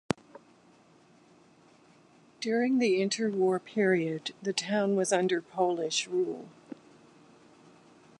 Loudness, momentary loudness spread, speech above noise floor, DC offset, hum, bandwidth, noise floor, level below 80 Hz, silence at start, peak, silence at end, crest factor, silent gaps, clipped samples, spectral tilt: -29 LUFS; 13 LU; 32 dB; under 0.1%; none; 11.5 kHz; -60 dBFS; -74 dBFS; 2.4 s; -8 dBFS; 1.7 s; 24 dB; none; under 0.1%; -4.5 dB/octave